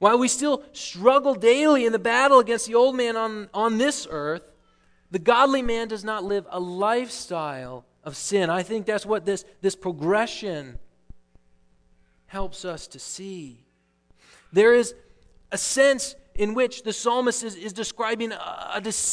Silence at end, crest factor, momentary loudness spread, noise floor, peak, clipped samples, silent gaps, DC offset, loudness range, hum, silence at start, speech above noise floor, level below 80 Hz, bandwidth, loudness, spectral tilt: 0 s; 22 dB; 16 LU; -63 dBFS; -2 dBFS; under 0.1%; none; under 0.1%; 11 LU; none; 0 s; 40 dB; -50 dBFS; 11 kHz; -23 LUFS; -3 dB/octave